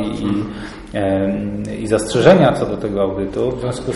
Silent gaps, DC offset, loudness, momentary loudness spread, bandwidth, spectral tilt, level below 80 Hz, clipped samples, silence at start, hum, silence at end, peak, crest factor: none; under 0.1%; -17 LUFS; 13 LU; 11.5 kHz; -6.5 dB/octave; -38 dBFS; under 0.1%; 0 s; none; 0 s; 0 dBFS; 16 dB